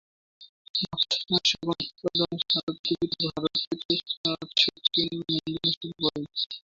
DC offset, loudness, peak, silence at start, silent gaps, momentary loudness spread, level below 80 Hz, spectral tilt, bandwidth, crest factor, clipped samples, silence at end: under 0.1%; -26 LUFS; -8 dBFS; 0.4 s; 0.49-0.74 s, 2.63-2.67 s, 2.79-2.84 s, 3.67-3.71 s, 3.85-3.89 s, 4.17-4.24 s, 5.77-5.81 s; 7 LU; -62 dBFS; -4 dB/octave; 7.8 kHz; 22 dB; under 0.1%; 0.05 s